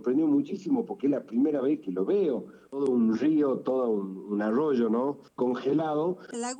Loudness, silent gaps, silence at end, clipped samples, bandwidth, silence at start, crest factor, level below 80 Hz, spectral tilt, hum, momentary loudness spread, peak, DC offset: -28 LUFS; none; 0 s; under 0.1%; 9.4 kHz; 0 s; 12 dB; -78 dBFS; -7 dB/octave; none; 7 LU; -16 dBFS; under 0.1%